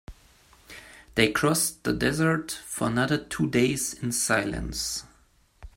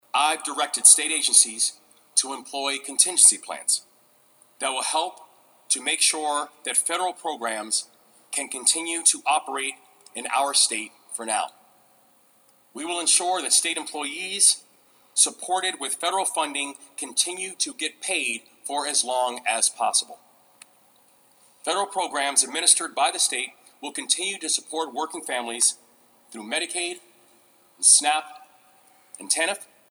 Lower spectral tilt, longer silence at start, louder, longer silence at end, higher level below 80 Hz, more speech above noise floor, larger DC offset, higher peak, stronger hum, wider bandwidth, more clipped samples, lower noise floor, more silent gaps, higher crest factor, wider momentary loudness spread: first, -4 dB/octave vs 2 dB/octave; about the same, 0.1 s vs 0.15 s; second, -26 LUFS vs -22 LUFS; second, 0.05 s vs 0.25 s; first, -48 dBFS vs under -90 dBFS; about the same, 36 dB vs 35 dB; neither; second, -6 dBFS vs 0 dBFS; neither; second, 16.5 kHz vs over 20 kHz; neither; about the same, -61 dBFS vs -59 dBFS; neither; about the same, 22 dB vs 26 dB; second, 11 LU vs 14 LU